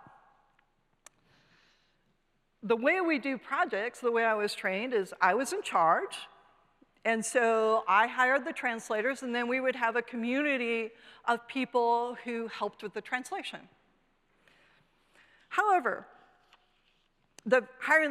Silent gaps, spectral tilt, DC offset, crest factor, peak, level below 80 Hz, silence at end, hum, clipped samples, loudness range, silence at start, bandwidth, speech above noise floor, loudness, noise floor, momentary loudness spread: none; -3.5 dB/octave; under 0.1%; 20 dB; -10 dBFS; -78 dBFS; 0 s; none; under 0.1%; 7 LU; 2.65 s; 14 kHz; 44 dB; -30 LUFS; -74 dBFS; 11 LU